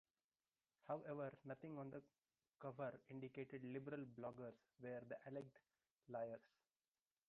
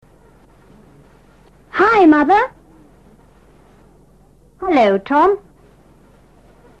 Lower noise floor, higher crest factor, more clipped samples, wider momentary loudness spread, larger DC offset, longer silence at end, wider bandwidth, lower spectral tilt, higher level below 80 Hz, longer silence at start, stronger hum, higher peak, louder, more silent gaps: first, under -90 dBFS vs -50 dBFS; about the same, 20 dB vs 16 dB; neither; second, 8 LU vs 14 LU; second, under 0.1% vs 0.1%; second, 0.8 s vs 1.4 s; second, 5.6 kHz vs 7.8 kHz; about the same, -7.5 dB/octave vs -6.5 dB/octave; second, -90 dBFS vs -50 dBFS; second, 0.85 s vs 1.75 s; neither; second, -36 dBFS vs -2 dBFS; second, -54 LUFS vs -14 LUFS; first, 5.91-5.96 s vs none